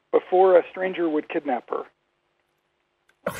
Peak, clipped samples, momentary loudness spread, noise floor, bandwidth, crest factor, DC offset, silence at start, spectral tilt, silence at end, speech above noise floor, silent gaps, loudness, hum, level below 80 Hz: -4 dBFS; under 0.1%; 16 LU; -72 dBFS; 13 kHz; 20 dB; under 0.1%; 0.15 s; -6 dB/octave; 0 s; 50 dB; none; -22 LUFS; none; -74 dBFS